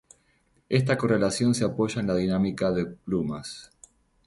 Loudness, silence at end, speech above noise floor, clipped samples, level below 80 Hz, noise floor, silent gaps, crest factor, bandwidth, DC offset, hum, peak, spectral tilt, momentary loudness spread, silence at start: -26 LUFS; 0.6 s; 41 dB; under 0.1%; -54 dBFS; -66 dBFS; none; 18 dB; 11.5 kHz; under 0.1%; none; -8 dBFS; -6 dB/octave; 9 LU; 0.7 s